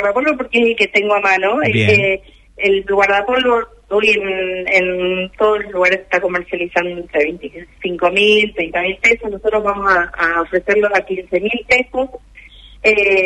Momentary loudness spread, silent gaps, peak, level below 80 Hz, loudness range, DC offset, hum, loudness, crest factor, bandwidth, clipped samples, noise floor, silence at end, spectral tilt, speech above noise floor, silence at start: 8 LU; none; -2 dBFS; -44 dBFS; 2 LU; under 0.1%; none; -15 LUFS; 14 dB; 10.5 kHz; under 0.1%; -40 dBFS; 0 s; -5 dB/octave; 25 dB; 0 s